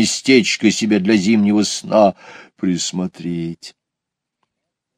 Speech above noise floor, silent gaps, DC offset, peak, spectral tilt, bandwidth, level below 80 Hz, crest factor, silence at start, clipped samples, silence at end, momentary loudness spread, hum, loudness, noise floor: 65 dB; none; under 0.1%; 0 dBFS; -4.5 dB/octave; 13.5 kHz; -60 dBFS; 16 dB; 0 s; under 0.1%; 1.25 s; 12 LU; none; -16 LUFS; -82 dBFS